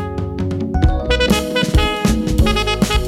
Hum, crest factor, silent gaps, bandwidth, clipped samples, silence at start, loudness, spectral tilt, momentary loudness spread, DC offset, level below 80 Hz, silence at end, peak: none; 12 dB; none; 16 kHz; under 0.1%; 0 s; -17 LUFS; -5 dB/octave; 7 LU; under 0.1%; -20 dBFS; 0 s; -4 dBFS